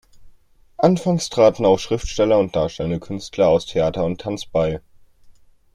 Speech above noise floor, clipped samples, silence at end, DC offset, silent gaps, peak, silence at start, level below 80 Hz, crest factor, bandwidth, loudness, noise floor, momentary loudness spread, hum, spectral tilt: 32 dB; under 0.1%; 0.45 s; under 0.1%; none; -2 dBFS; 0.2 s; -42 dBFS; 18 dB; 12.5 kHz; -19 LUFS; -51 dBFS; 10 LU; none; -6 dB/octave